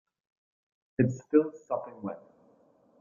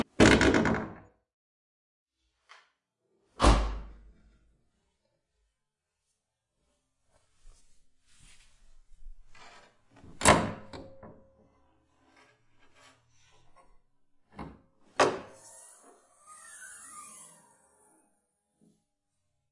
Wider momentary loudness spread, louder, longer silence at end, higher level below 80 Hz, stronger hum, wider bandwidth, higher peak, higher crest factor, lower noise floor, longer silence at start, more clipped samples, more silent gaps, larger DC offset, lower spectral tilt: second, 15 LU vs 27 LU; second, -30 LUFS vs -26 LUFS; second, 0.8 s vs 2.5 s; second, -70 dBFS vs -42 dBFS; neither; second, 7.2 kHz vs 11.5 kHz; second, -10 dBFS vs -6 dBFS; second, 22 dB vs 28 dB; second, -64 dBFS vs -85 dBFS; first, 1 s vs 0.2 s; neither; second, none vs 1.33-2.06 s; neither; first, -10 dB/octave vs -4.5 dB/octave